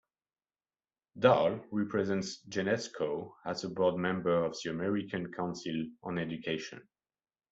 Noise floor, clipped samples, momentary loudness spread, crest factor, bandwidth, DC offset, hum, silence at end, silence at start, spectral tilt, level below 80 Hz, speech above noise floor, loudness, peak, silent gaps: under -90 dBFS; under 0.1%; 10 LU; 24 dB; 8 kHz; under 0.1%; none; 0.7 s; 1.15 s; -5.5 dB/octave; -70 dBFS; over 57 dB; -33 LUFS; -10 dBFS; none